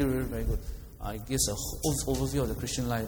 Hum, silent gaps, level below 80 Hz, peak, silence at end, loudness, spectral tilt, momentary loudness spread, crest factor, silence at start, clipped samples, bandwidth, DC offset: none; none; -38 dBFS; -14 dBFS; 0 s; -31 LUFS; -4.5 dB/octave; 11 LU; 16 dB; 0 s; under 0.1%; over 20 kHz; under 0.1%